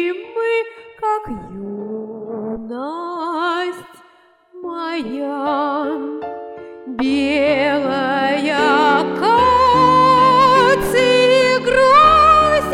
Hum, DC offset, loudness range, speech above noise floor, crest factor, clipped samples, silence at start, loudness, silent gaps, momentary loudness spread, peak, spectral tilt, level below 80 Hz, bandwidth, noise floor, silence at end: none; under 0.1%; 13 LU; 28 dB; 14 dB; under 0.1%; 0 s; -14 LUFS; none; 18 LU; -2 dBFS; -4.5 dB/octave; -42 dBFS; 16 kHz; -51 dBFS; 0 s